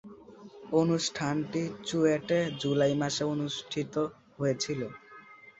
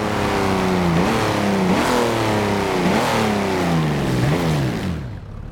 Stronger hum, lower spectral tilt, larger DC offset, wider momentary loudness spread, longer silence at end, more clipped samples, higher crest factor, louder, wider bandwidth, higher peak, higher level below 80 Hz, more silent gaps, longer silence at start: neither; about the same, -5 dB/octave vs -5.5 dB/octave; neither; first, 22 LU vs 5 LU; about the same, 0.1 s vs 0 s; neither; about the same, 18 dB vs 14 dB; second, -30 LUFS vs -19 LUFS; second, 8.2 kHz vs 18 kHz; second, -12 dBFS vs -6 dBFS; second, -66 dBFS vs -38 dBFS; neither; about the same, 0.05 s vs 0 s